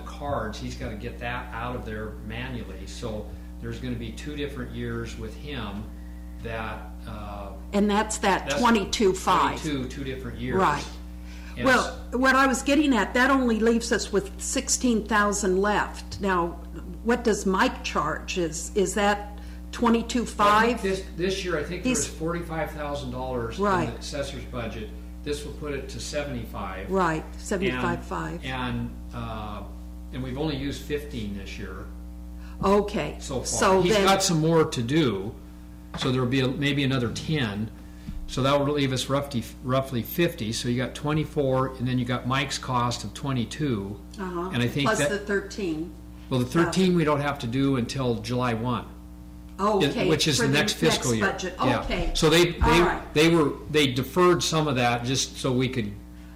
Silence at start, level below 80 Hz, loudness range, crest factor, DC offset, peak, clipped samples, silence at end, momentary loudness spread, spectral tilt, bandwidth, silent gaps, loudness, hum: 0 s; -40 dBFS; 11 LU; 14 dB; under 0.1%; -12 dBFS; under 0.1%; 0 s; 16 LU; -4.5 dB/octave; 16 kHz; none; -25 LUFS; none